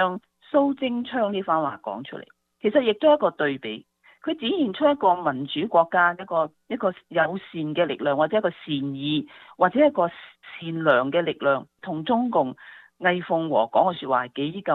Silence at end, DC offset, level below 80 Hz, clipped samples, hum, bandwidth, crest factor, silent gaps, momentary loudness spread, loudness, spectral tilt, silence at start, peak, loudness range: 0 s; under 0.1%; -70 dBFS; under 0.1%; none; 4.3 kHz; 18 dB; none; 14 LU; -24 LUFS; -8.5 dB/octave; 0 s; -4 dBFS; 2 LU